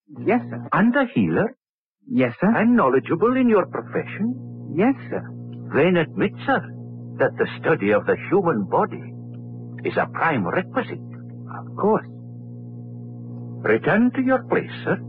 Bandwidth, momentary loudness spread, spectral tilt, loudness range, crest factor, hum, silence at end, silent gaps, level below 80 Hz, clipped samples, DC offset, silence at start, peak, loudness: 4.7 kHz; 18 LU; -10.5 dB/octave; 5 LU; 14 dB; 60 Hz at -40 dBFS; 0 s; 1.70-1.91 s; -62 dBFS; under 0.1%; under 0.1%; 0.1 s; -8 dBFS; -21 LUFS